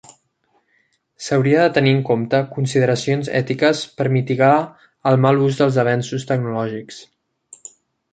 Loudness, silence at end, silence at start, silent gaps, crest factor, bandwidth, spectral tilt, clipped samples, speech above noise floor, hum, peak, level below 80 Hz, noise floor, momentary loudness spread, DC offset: -18 LUFS; 1.1 s; 1.2 s; none; 16 dB; 9.2 kHz; -6.5 dB/octave; under 0.1%; 47 dB; none; -2 dBFS; -60 dBFS; -64 dBFS; 17 LU; under 0.1%